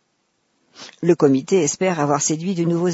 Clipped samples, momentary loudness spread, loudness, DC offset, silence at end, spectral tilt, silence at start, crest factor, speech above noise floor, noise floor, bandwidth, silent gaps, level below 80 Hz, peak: under 0.1%; 5 LU; -19 LUFS; under 0.1%; 0 s; -5 dB/octave; 0.8 s; 16 dB; 50 dB; -68 dBFS; 8 kHz; none; -68 dBFS; -4 dBFS